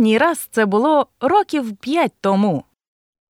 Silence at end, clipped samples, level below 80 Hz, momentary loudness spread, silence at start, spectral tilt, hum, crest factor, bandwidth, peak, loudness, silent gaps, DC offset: 0.7 s; under 0.1%; -64 dBFS; 7 LU; 0 s; -5.5 dB/octave; none; 14 dB; 16.5 kHz; -4 dBFS; -18 LUFS; none; under 0.1%